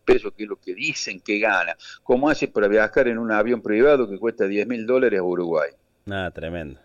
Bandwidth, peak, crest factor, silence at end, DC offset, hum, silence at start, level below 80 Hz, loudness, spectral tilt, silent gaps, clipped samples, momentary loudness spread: 7.6 kHz; -8 dBFS; 14 dB; 0.1 s; under 0.1%; none; 0.05 s; -46 dBFS; -22 LUFS; -5 dB/octave; none; under 0.1%; 13 LU